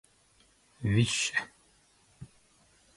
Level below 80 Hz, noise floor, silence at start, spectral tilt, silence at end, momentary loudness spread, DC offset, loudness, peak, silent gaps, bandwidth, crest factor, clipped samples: -56 dBFS; -65 dBFS; 0.8 s; -4 dB/octave; 0.7 s; 26 LU; under 0.1%; -29 LUFS; -12 dBFS; none; 11.5 kHz; 22 dB; under 0.1%